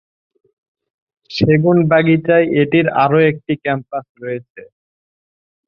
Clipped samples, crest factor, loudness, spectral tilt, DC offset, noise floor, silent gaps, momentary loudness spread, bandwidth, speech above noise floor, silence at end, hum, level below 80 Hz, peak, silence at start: under 0.1%; 16 dB; -14 LUFS; -8.5 dB/octave; under 0.1%; under -90 dBFS; 4.09-4.15 s, 4.50-4.55 s; 14 LU; 6.8 kHz; over 76 dB; 1.05 s; none; -50 dBFS; -2 dBFS; 1.3 s